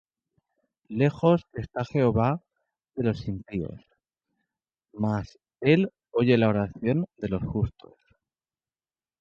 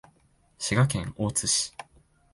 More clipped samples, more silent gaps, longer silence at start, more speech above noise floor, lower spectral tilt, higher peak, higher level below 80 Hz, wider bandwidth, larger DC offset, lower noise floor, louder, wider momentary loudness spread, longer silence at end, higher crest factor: neither; neither; first, 0.9 s vs 0.6 s; first, over 65 dB vs 38 dB; first, -9 dB/octave vs -3.5 dB/octave; about the same, -8 dBFS vs -10 dBFS; about the same, -50 dBFS vs -52 dBFS; second, 7.2 kHz vs 11.5 kHz; neither; first, under -90 dBFS vs -64 dBFS; about the same, -26 LUFS vs -26 LUFS; about the same, 12 LU vs 10 LU; first, 1.5 s vs 0.5 s; about the same, 20 dB vs 20 dB